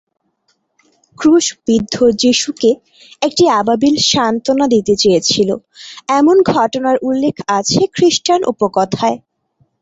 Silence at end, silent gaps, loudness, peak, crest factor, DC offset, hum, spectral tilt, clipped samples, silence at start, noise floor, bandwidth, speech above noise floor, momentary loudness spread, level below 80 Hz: 0.65 s; none; -13 LUFS; -2 dBFS; 12 dB; under 0.1%; none; -4 dB/octave; under 0.1%; 1.2 s; -64 dBFS; 8.2 kHz; 50 dB; 7 LU; -50 dBFS